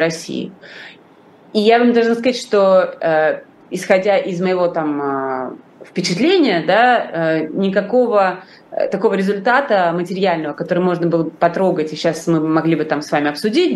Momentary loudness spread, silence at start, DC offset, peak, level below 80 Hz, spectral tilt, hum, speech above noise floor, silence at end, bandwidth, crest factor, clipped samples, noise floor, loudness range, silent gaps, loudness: 12 LU; 0 s; under 0.1%; 0 dBFS; -68 dBFS; -5.5 dB/octave; none; 30 dB; 0 s; 12.5 kHz; 16 dB; under 0.1%; -46 dBFS; 2 LU; none; -16 LUFS